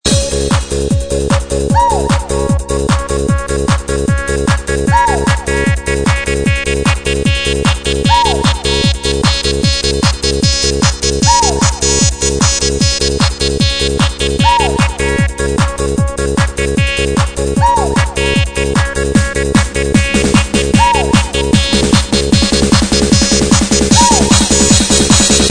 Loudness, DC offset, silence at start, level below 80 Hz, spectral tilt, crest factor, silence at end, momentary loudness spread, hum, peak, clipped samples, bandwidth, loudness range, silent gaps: -11 LUFS; 1%; 0.05 s; -20 dBFS; -4 dB/octave; 12 dB; 0 s; 6 LU; none; 0 dBFS; 0.1%; 11 kHz; 4 LU; none